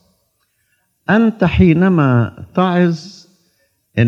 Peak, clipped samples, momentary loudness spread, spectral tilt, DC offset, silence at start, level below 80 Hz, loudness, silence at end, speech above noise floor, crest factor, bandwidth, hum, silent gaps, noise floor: 0 dBFS; under 0.1%; 12 LU; -8.5 dB/octave; under 0.1%; 1.1 s; -38 dBFS; -14 LUFS; 0 s; 51 dB; 16 dB; 7 kHz; none; none; -64 dBFS